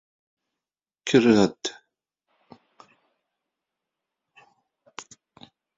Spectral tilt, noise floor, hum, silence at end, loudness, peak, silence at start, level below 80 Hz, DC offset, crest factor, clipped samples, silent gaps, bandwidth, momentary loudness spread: -5 dB/octave; under -90 dBFS; none; 0.75 s; -22 LUFS; -4 dBFS; 1.05 s; -66 dBFS; under 0.1%; 24 dB; under 0.1%; none; 7.8 kHz; 25 LU